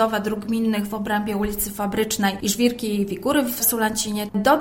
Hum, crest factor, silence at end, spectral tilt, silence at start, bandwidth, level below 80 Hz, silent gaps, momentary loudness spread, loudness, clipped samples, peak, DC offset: none; 18 dB; 0 s; -4 dB/octave; 0 s; 16.5 kHz; -46 dBFS; none; 5 LU; -22 LUFS; under 0.1%; -4 dBFS; under 0.1%